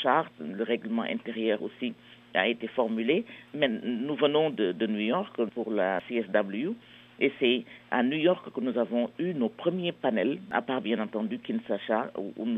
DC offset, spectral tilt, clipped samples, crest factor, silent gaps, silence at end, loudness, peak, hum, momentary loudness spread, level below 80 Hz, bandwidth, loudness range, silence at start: under 0.1%; -8 dB/octave; under 0.1%; 20 dB; none; 0 s; -29 LUFS; -8 dBFS; none; 7 LU; -78 dBFS; 4.2 kHz; 2 LU; 0 s